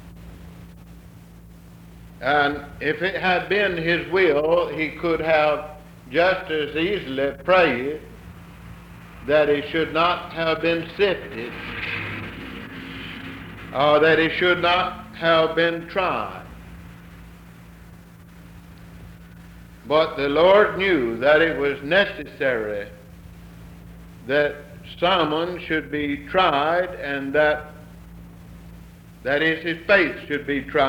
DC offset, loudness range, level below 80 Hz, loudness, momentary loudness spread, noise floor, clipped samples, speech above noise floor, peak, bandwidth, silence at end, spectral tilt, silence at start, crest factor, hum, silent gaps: under 0.1%; 6 LU; -48 dBFS; -21 LUFS; 20 LU; -45 dBFS; under 0.1%; 24 dB; -4 dBFS; 19.5 kHz; 0 s; -6 dB/octave; 0 s; 18 dB; none; none